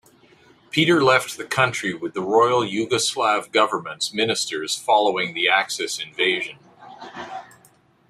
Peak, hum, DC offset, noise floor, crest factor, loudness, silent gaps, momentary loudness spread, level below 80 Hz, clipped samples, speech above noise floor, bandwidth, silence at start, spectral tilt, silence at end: -2 dBFS; none; under 0.1%; -56 dBFS; 20 dB; -20 LUFS; none; 15 LU; -66 dBFS; under 0.1%; 35 dB; 15.5 kHz; 0.75 s; -3 dB/octave; 0.65 s